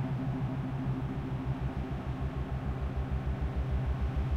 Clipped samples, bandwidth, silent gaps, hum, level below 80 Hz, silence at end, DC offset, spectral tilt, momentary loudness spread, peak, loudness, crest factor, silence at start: under 0.1%; 6.6 kHz; none; none; -38 dBFS; 0 s; under 0.1%; -9 dB/octave; 3 LU; -22 dBFS; -35 LUFS; 12 dB; 0 s